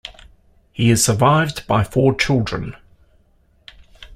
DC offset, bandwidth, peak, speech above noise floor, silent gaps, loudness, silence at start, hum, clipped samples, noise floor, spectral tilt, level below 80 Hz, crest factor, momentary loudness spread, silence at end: under 0.1%; 15.5 kHz; -2 dBFS; 40 dB; none; -17 LUFS; 0.05 s; none; under 0.1%; -57 dBFS; -5 dB/octave; -42 dBFS; 18 dB; 17 LU; 0 s